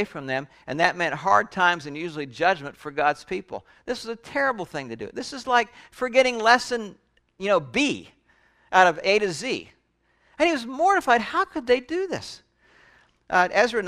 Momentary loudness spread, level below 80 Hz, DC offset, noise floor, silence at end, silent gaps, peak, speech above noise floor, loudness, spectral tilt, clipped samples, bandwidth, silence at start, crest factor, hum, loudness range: 14 LU; -60 dBFS; under 0.1%; -67 dBFS; 0 s; none; -2 dBFS; 43 dB; -23 LUFS; -3.5 dB/octave; under 0.1%; 14 kHz; 0 s; 24 dB; none; 5 LU